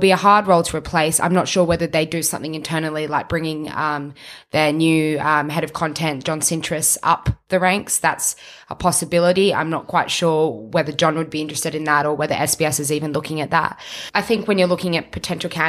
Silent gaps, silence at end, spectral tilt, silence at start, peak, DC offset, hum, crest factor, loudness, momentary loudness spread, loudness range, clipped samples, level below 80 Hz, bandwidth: none; 0 s; -4 dB/octave; 0 s; -2 dBFS; under 0.1%; none; 18 dB; -19 LUFS; 7 LU; 2 LU; under 0.1%; -46 dBFS; 15.5 kHz